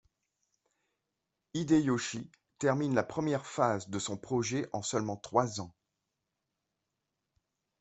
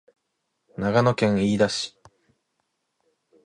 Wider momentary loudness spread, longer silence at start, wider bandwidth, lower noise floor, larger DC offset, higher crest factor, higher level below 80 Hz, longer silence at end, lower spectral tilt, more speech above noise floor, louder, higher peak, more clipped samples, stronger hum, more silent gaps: about the same, 12 LU vs 12 LU; first, 1.55 s vs 0.8 s; second, 8.4 kHz vs 11 kHz; first, -86 dBFS vs -77 dBFS; neither; about the same, 24 dB vs 20 dB; second, -70 dBFS vs -56 dBFS; first, 2.1 s vs 1.55 s; about the same, -5 dB/octave vs -5.5 dB/octave; about the same, 54 dB vs 56 dB; second, -32 LUFS vs -22 LUFS; second, -12 dBFS vs -6 dBFS; neither; neither; neither